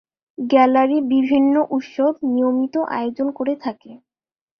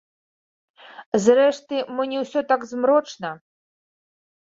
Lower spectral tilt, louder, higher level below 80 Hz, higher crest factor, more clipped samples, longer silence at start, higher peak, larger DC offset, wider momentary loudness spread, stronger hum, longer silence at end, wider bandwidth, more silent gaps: first, -6.5 dB/octave vs -4.5 dB/octave; first, -18 LUFS vs -21 LUFS; first, -64 dBFS vs -70 dBFS; about the same, 16 dB vs 20 dB; neither; second, 0.4 s vs 1 s; about the same, -2 dBFS vs -4 dBFS; neither; second, 10 LU vs 15 LU; neither; second, 0.65 s vs 1.1 s; second, 6.2 kHz vs 7.8 kHz; second, none vs 1.06-1.12 s